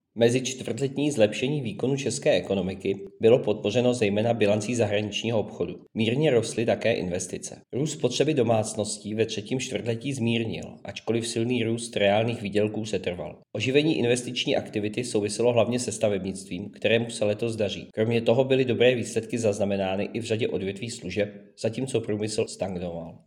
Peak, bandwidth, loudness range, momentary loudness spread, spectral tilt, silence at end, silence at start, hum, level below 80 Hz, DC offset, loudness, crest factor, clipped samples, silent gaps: -6 dBFS; 14 kHz; 3 LU; 9 LU; -5 dB/octave; 0.1 s; 0.15 s; none; -66 dBFS; under 0.1%; -26 LUFS; 20 dB; under 0.1%; none